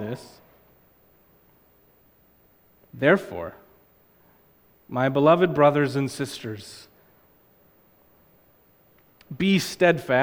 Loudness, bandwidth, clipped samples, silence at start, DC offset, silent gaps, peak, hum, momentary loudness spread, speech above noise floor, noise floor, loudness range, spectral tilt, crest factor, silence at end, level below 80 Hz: -22 LUFS; 19 kHz; under 0.1%; 0 s; under 0.1%; none; -4 dBFS; none; 20 LU; 38 dB; -60 dBFS; 11 LU; -6 dB/octave; 22 dB; 0 s; -62 dBFS